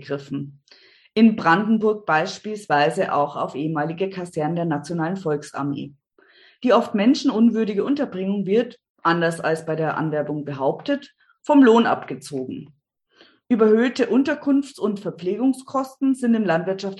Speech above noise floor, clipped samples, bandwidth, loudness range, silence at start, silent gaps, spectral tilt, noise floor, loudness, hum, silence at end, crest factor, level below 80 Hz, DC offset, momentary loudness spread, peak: 36 dB; under 0.1%; 12 kHz; 4 LU; 0 s; 8.90-8.95 s; -6.5 dB/octave; -57 dBFS; -21 LUFS; none; 0 s; 18 dB; -70 dBFS; under 0.1%; 12 LU; -2 dBFS